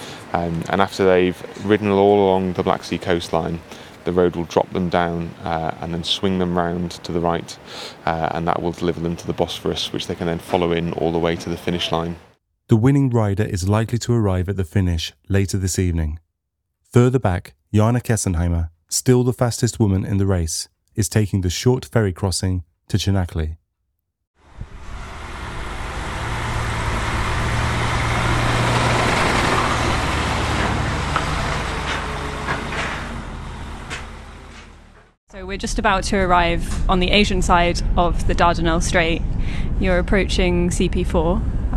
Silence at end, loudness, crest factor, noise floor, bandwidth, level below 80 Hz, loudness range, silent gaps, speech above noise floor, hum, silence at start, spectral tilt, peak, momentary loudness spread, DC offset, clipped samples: 0 s; -20 LUFS; 20 dB; -77 dBFS; 16.5 kHz; -28 dBFS; 8 LU; 24.27-24.34 s, 35.17-35.27 s; 58 dB; none; 0 s; -5.5 dB/octave; 0 dBFS; 13 LU; under 0.1%; under 0.1%